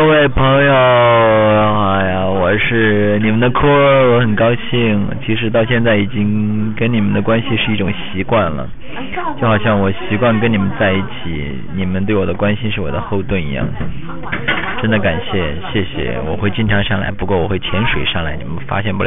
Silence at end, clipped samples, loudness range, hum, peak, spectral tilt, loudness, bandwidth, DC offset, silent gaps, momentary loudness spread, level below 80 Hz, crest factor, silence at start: 0 s; under 0.1%; 6 LU; none; -4 dBFS; -9.5 dB/octave; -15 LUFS; 3.9 kHz; 7%; none; 11 LU; -32 dBFS; 12 dB; 0 s